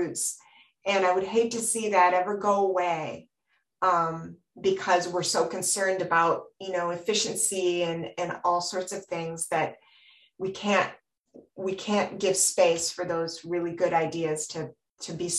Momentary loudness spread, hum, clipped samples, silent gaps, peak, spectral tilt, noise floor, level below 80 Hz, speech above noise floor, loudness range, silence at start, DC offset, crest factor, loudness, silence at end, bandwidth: 11 LU; none; under 0.1%; none; -8 dBFS; -3 dB/octave; -75 dBFS; -70 dBFS; 48 dB; 4 LU; 0 s; under 0.1%; 20 dB; -27 LUFS; 0 s; 16 kHz